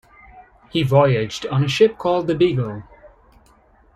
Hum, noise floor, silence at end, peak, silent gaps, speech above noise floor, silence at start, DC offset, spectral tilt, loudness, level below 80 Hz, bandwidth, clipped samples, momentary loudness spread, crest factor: none; -54 dBFS; 0.9 s; -2 dBFS; none; 36 dB; 0.35 s; under 0.1%; -6.5 dB/octave; -19 LUFS; -50 dBFS; 12 kHz; under 0.1%; 10 LU; 18 dB